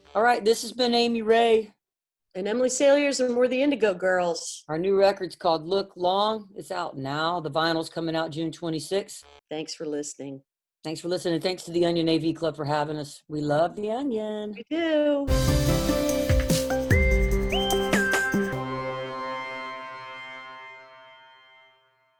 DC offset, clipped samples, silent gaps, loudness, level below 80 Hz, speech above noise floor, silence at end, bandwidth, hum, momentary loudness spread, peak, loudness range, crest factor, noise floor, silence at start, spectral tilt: under 0.1%; under 0.1%; none; -25 LUFS; -36 dBFS; 63 dB; 1.05 s; over 20 kHz; none; 14 LU; -8 dBFS; 8 LU; 18 dB; -88 dBFS; 0.15 s; -5 dB/octave